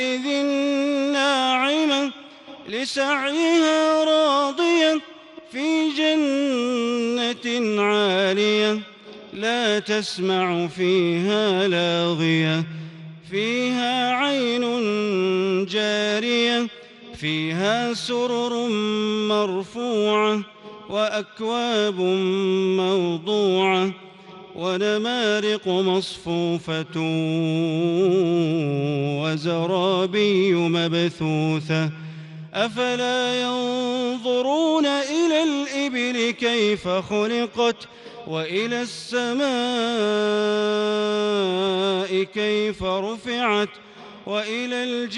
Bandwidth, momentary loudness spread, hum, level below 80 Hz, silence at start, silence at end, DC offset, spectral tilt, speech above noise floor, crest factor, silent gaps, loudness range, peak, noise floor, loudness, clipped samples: 11.5 kHz; 8 LU; none; -64 dBFS; 0 s; 0 s; under 0.1%; -5 dB/octave; 21 dB; 14 dB; none; 3 LU; -8 dBFS; -43 dBFS; -22 LUFS; under 0.1%